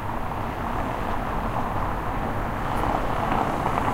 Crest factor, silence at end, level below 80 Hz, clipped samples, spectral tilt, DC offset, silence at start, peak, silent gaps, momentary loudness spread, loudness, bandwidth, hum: 18 dB; 0 s; -34 dBFS; under 0.1%; -6.5 dB/octave; under 0.1%; 0 s; -8 dBFS; none; 5 LU; -27 LUFS; 16 kHz; none